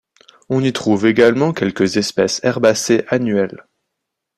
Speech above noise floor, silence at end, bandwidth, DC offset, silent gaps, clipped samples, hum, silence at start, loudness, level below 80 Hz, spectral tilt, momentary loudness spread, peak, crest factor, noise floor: 63 dB; 0.8 s; 14 kHz; under 0.1%; none; under 0.1%; none; 0.5 s; -16 LUFS; -56 dBFS; -5 dB/octave; 6 LU; 0 dBFS; 16 dB; -78 dBFS